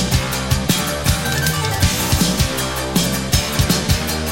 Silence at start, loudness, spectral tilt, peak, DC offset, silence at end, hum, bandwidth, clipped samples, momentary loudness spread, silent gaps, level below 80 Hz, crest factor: 0 s; -17 LUFS; -3.5 dB/octave; -2 dBFS; under 0.1%; 0 s; none; 16.5 kHz; under 0.1%; 3 LU; none; -26 dBFS; 16 dB